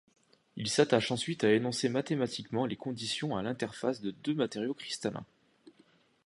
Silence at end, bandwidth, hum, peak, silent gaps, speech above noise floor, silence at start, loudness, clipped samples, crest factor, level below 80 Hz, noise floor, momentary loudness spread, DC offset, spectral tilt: 0.55 s; 11.5 kHz; none; -10 dBFS; none; 34 dB; 0.55 s; -32 LUFS; under 0.1%; 22 dB; -70 dBFS; -66 dBFS; 9 LU; under 0.1%; -4.5 dB/octave